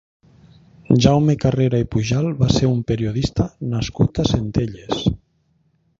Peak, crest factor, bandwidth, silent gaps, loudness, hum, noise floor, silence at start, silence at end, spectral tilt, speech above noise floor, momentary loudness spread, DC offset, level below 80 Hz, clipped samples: 0 dBFS; 18 dB; 7.6 kHz; none; -19 LUFS; none; -63 dBFS; 0.9 s; 0.85 s; -7 dB/octave; 45 dB; 8 LU; under 0.1%; -36 dBFS; under 0.1%